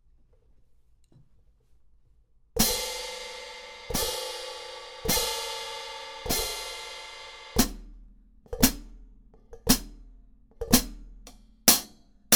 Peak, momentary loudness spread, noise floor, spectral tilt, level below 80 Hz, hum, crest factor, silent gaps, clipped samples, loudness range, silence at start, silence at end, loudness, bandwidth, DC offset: 0 dBFS; 18 LU; -60 dBFS; -2 dB/octave; -42 dBFS; none; 30 dB; none; under 0.1%; 6 LU; 2.55 s; 0 s; -27 LUFS; over 20 kHz; under 0.1%